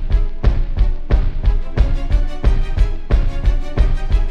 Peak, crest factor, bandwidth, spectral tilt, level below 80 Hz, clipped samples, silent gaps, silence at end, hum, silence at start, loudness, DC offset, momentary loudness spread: -2 dBFS; 12 dB; 5.8 kHz; -7.5 dB/octave; -14 dBFS; under 0.1%; none; 0 s; none; 0 s; -20 LUFS; under 0.1%; 3 LU